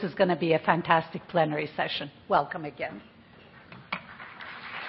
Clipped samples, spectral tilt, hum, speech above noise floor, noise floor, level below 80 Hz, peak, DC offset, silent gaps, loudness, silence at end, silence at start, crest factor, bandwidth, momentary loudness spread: under 0.1%; -9.5 dB/octave; none; 25 dB; -52 dBFS; -66 dBFS; -6 dBFS; under 0.1%; none; -28 LUFS; 0 s; 0 s; 24 dB; 5.8 kHz; 18 LU